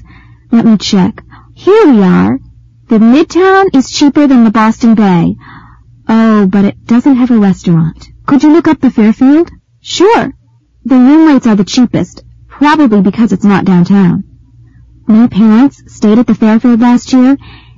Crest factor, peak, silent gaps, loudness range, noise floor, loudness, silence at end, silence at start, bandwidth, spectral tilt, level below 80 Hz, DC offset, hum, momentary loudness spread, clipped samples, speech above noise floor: 8 dB; 0 dBFS; none; 2 LU; -38 dBFS; -7 LUFS; 0.4 s; 0.5 s; 7.6 kHz; -6.5 dB/octave; -40 dBFS; 0.9%; none; 9 LU; 0.4%; 32 dB